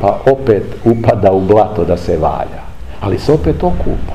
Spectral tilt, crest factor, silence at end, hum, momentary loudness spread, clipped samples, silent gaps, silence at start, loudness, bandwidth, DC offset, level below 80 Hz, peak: -8.5 dB/octave; 12 dB; 0 s; none; 11 LU; 0.3%; none; 0 s; -13 LUFS; 13 kHz; 4%; -26 dBFS; 0 dBFS